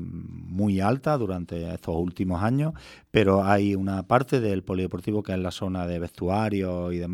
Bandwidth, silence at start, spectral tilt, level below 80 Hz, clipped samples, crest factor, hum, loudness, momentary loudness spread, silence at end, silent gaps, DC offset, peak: 14.5 kHz; 0 s; -7.5 dB/octave; -50 dBFS; under 0.1%; 22 dB; none; -26 LUFS; 10 LU; 0 s; none; under 0.1%; -4 dBFS